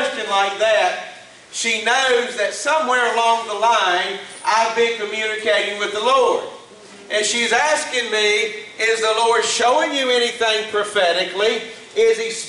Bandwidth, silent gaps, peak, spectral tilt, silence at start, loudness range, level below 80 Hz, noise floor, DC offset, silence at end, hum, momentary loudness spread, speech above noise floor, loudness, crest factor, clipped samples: 11.5 kHz; none; -4 dBFS; -0.5 dB/octave; 0 s; 2 LU; -66 dBFS; -41 dBFS; under 0.1%; 0 s; none; 6 LU; 23 dB; -18 LUFS; 14 dB; under 0.1%